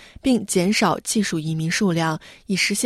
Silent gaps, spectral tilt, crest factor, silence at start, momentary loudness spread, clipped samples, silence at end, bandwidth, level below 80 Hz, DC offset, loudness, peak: none; -4 dB/octave; 16 dB; 0 s; 6 LU; under 0.1%; 0 s; 15.5 kHz; -52 dBFS; under 0.1%; -21 LUFS; -6 dBFS